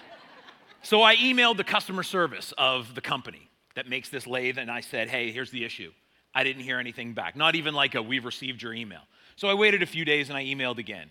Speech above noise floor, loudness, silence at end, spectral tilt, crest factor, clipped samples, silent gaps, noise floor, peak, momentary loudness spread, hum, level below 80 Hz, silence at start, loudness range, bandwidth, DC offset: 25 dB; -25 LUFS; 0.05 s; -3.5 dB/octave; 24 dB; under 0.1%; none; -52 dBFS; -4 dBFS; 15 LU; none; -76 dBFS; 0 s; 7 LU; 17.5 kHz; under 0.1%